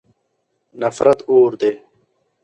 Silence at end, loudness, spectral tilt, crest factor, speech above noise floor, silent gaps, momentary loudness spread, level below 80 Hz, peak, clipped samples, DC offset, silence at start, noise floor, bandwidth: 0.65 s; -16 LUFS; -6 dB/octave; 18 dB; 55 dB; none; 10 LU; -60 dBFS; 0 dBFS; under 0.1%; under 0.1%; 0.75 s; -69 dBFS; 8.8 kHz